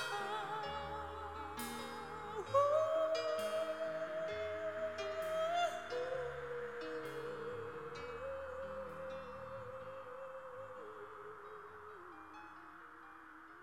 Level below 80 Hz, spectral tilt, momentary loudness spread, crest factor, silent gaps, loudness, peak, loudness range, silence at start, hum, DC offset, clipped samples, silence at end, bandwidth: -68 dBFS; -4 dB/octave; 17 LU; 22 dB; none; -41 LUFS; -20 dBFS; 13 LU; 0 s; none; under 0.1%; under 0.1%; 0 s; 16 kHz